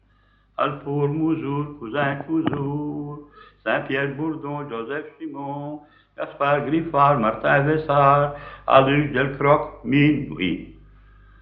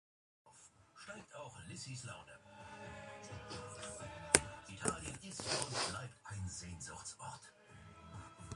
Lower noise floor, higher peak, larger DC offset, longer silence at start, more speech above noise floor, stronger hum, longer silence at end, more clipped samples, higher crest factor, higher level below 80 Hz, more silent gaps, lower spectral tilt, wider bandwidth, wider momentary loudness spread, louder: second, -59 dBFS vs -64 dBFS; about the same, 0 dBFS vs -2 dBFS; neither; first, 0.6 s vs 0.45 s; first, 37 dB vs 19 dB; first, 50 Hz at -55 dBFS vs none; first, 0.65 s vs 0 s; neither; second, 22 dB vs 42 dB; first, -50 dBFS vs -62 dBFS; neither; first, -5 dB/octave vs -2.5 dB/octave; second, 4.9 kHz vs 11.5 kHz; second, 15 LU vs 21 LU; first, -22 LUFS vs -42 LUFS